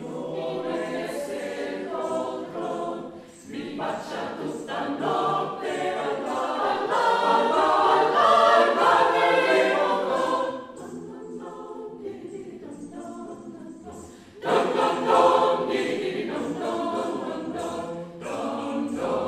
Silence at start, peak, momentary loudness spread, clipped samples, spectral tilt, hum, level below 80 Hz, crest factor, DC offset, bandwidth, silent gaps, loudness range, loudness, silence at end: 0 s; -6 dBFS; 20 LU; under 0.1%; -4.5 dB/octave; none; -66 dBFS; 20 dB; under 0.1%; 14.5 kHz; none; 12 LU; -24 LUFS; 0 s